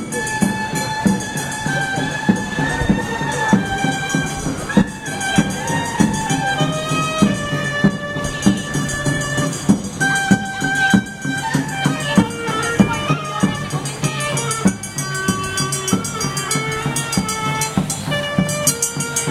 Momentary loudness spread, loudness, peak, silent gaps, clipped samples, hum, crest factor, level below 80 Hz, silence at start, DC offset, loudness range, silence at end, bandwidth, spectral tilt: 5 LU; -19 LUFS; -2 dBFS; none; under 0.1%; none; 18 dB; -40 dBFS; 0 s; under 0.1%; 2 LU; 0 s; 16 kHz; -4 dB/octave